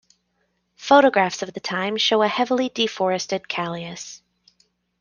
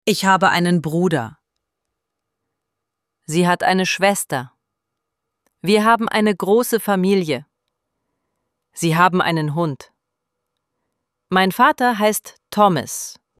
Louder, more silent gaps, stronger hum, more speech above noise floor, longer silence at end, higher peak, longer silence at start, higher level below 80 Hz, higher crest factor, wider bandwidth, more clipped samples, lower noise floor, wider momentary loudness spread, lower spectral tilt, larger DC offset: second, -21 LUFS vs -18 LUFS; neither; first, 60 Hz at -55 dBFS vs none; second, 50 dB vs 63 dB; first, 0.85 s vs 0.25 s; about the same, -2 dBFS vs -2 dBFS; first, 0.8 s vs 0.05 s; second, -68 dBFS vs -62 dBFS; about the same, 20 dB vs 18 dB; second, 10 kHz vs 15.5 kHz; neither; second, -70 dBFS vs -80 dBFS; first, 17 LU vs 11 LU; about the same, -3.5 dB/octave vs -4.5 dB/octave; neither